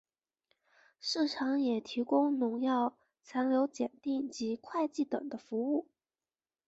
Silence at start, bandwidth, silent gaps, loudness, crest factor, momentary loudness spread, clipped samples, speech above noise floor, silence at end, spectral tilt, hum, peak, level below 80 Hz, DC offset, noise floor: 1.05 s; 8 kHz; none; -34 LUFS; 16 dB; 7 LU; under 0.1%; over 57 dB; 0.85 s; -4.5 dB/octave; none; -18 dBFS; -80 dBFS; under 0.1%; under -90 dBFS